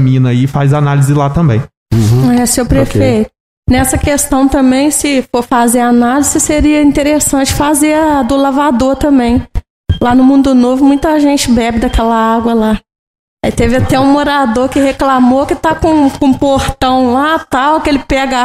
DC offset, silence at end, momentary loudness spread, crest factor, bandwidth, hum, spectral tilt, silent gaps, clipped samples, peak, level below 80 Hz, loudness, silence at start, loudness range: 0.4%; 0 s; 4 LU; 8 dB; 15.5 kHz; none; -5.5 dB/octave; 1.77-1.86 s, 3.40-3.63 s, 9.70-9.84 s, 12.99-13.37 s; under 0.1%; 0 dBFS; -26 dBFS; -10 LUFS; 0 s; 2 LU